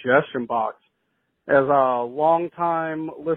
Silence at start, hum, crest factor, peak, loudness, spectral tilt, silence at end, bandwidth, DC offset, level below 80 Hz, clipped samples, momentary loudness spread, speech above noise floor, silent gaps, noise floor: 0 s; none; 18 dB; -4 dBFS; -22 LUFS; -10 dB/octave; 0 s; 4.1 kHz; under 0.1%; -66 dBFS; under 0.1%; 10 LU; 52 dB; none; -72 dBFS